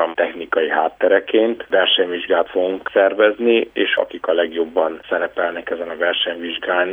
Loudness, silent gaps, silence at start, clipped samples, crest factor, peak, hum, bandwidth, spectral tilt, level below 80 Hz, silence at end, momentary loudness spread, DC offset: -18 LUFS; none; 0 s; under 0.1%; 16 dB; -2 dBFS; none; 3.8 kHz; -5.5 dB/octave; -60 dBFS; 0 s; 7 LU; under 0.1%